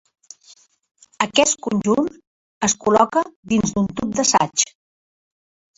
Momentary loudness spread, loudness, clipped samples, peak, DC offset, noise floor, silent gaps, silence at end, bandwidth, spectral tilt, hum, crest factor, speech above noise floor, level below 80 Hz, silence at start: 7 LU; -19 LUFS; under 0.1%; -2 dBFS; under 0.1%; -52 dBFS; 2.27-2.61 s, 3.36-3.43 s; 1.15 s; 8 kHz; -3 dB/octave; none; 20 dB; 33 dB; -54 dBFS; 1.2 s